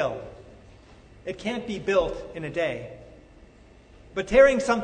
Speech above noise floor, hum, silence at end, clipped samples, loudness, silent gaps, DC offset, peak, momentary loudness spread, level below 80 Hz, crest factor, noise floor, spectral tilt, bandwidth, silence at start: 28 dB; none; 0 s; under 0.1%; -24 LUFS; none; under 0.1%; -6 dBFS; 21 LU; -48 dBFS; 22 dB; -52 dBFS; -5 dB/octave; 9.4 kHz; 0 s